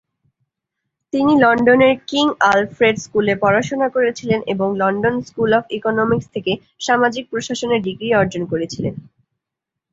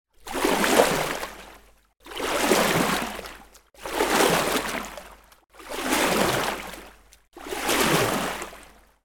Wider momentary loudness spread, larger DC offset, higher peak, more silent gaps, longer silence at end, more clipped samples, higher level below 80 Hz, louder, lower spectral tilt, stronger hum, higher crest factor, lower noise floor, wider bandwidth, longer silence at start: second, 11 LU vs 19 LU; neither; about the same, -2 dBFS vs -2 dBFS; neither; first, 0.9 s vs 0.4 s; neither; about the same, -52 dBFS vs -48 dBFS; first, -17 LUFS vs -23 LUFS; first, -5 dB/octave vs -3 dB/octave; neither; second, 16 dB vs 24 dB; first, -83 dBFS vs -51 dBFS; second, 8 kHz vs 19.5 kHz; first, 1.15 s vs 0.25 s